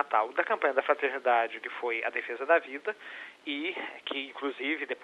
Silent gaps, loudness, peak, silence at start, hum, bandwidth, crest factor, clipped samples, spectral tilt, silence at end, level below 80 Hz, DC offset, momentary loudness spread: none; -30 LUFS; -10 dBFS; 0 s; none; 10.5 kHz; 20 dB; under 0.1%; -3 dB/octave; 0 s; -88 dBFS; under 0.1%; 10 LU